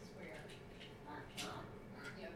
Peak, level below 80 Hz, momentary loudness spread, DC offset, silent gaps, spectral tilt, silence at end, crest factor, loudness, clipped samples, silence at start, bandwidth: -32 dBFS; -66 dBFS; 7 LU; under 0.1%; none; -4 dB/octave; 0 s; 20 dB; -51 LUFS; under 0.1%; 0 s; 18 kHz